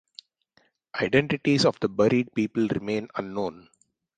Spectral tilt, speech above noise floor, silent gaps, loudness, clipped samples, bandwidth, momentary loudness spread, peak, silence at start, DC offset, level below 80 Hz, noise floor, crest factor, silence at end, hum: -6 dB/octave; 42 dB; none; -25 LUFS; under 0.1%; 9.6 kHz; 10 LU; -4 dBFS; 0.95 s; under 0.1%; -60 dBFS; -66 dBFS; 22 dB; 0.6 s; none